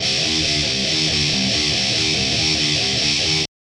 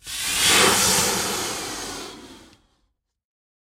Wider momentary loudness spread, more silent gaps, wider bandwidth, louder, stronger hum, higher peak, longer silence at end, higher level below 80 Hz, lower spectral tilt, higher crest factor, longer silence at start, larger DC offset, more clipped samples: second, 1 LU vs 18 LU; neither; second, 13 kHz vs 16 kHz; about the same, -16 LUFS vs -18 LUFS; neither; about the same, -6 dBFS vs -4 dBFS; second, 0.35 s vs 1.2 s; first, -40 dBFS vs -50 dBFS; about the same, -2 dB/octave vs -1 dB/octave; second, 14 dB vs 20 dB; about the same, 0 s vs 0.05 s; neither; neither